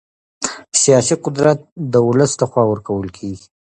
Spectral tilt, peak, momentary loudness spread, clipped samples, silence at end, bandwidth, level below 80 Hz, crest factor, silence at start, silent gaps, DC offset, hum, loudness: -4.5 dB/octave; 0 dBFS; 14 LU; under 0.1%; 0.4 s; 9.8 kHz; -50 dBFS; 16 dB; 0.4 s; 1.72-1.76 s; under 0.1%; none; -16 LUFS